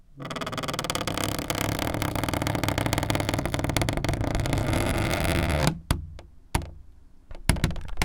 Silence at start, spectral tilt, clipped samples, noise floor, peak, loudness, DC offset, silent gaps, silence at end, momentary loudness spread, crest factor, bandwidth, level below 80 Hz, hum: 0.15 s; -4.5 dB/octave; under 0.1%; -48 dBFS; 0 dBFS; -27 LUFS; under 0.1%; none; 0 s; 7 LU; 26 dB; 19 kHz; -36 dBFS; none